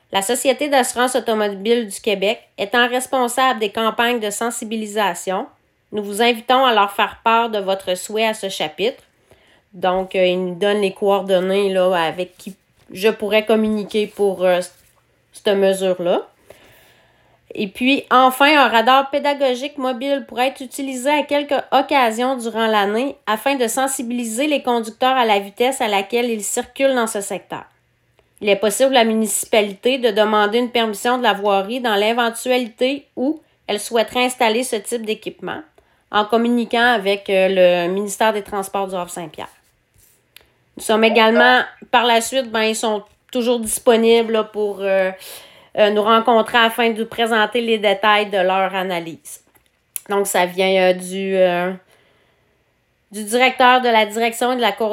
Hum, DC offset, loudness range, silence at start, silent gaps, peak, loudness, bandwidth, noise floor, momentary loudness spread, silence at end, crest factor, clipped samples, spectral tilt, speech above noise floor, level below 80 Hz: none; under 0.1%; 4 LU; 0.1 s; none; 0 dBFS; -17 LUFS; 16.5 kHz; -63 dBFS; 12 LU; 0 s; 18 dB; under 0.1%; -3 dB/octave; 46 dB; -62 dBFS